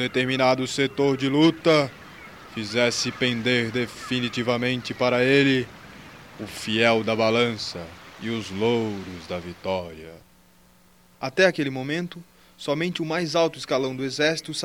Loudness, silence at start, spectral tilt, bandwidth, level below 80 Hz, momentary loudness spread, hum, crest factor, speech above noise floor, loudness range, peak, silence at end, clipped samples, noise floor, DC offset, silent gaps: -23 LUFS; 0 s; -4.5 dB/octave; 16.5 kHz; -60 dBFS; 17 LU; none; 20 dB; 33 dB; 5 LU; -4 dBFS; 0 s; under 0.1%; -56 dBFS; under 0.1%; none